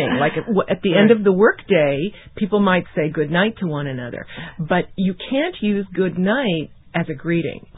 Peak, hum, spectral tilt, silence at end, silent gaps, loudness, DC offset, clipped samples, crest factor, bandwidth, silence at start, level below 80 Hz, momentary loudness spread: -2 dBFS; none; -11.5 dB/octave; 0 s; none; -19 LUFS; under 0.1%; under 0.1%; 18 dB; 4 kHz; 0 s; -50 dBFS; 12 LU